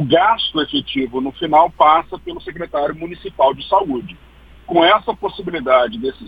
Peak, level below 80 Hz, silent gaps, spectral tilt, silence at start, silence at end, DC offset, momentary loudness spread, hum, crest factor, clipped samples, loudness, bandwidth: 0 dBFS; -46 dBFS; none; -7.5 dB/octave; 0 s; 0 s; under 0.1%; 16 LU; none; 16 dB; under 0.1%; -16 LUFS; 5 kHz